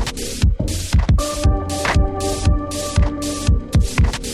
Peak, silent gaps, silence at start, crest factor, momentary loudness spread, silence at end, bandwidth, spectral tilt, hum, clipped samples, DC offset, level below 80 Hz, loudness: -4 dBFS; none; 0 s; 14 dB; 4 LU; 0 s; 14 kHz; -5 dB/octave; none; under 0.1%; under 0.1%; -20 dBFS; -19 LUFS